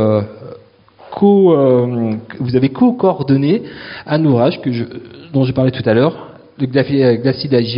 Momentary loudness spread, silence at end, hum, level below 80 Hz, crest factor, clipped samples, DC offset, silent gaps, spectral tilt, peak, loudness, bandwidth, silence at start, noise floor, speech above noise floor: 17 LU; 0 s; none; -50 dBFS; 14 dB; under 0.1%; under 0.1%; none; -7 dB/octave; 0 dBFS; -14 LUFS; 5.4 kHz; 0 s; -44 dBFS; 30 dB